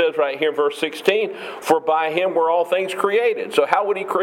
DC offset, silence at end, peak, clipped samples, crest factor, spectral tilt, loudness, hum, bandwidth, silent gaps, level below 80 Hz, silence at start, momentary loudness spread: under 0.1%; 0 s; 0 dBFS; under 0.1%; 20 dB; -3.5 dB/octave; -20 LUFS; none; 16.5 kHz; none; -80 dBFS; 0 s; 3 LU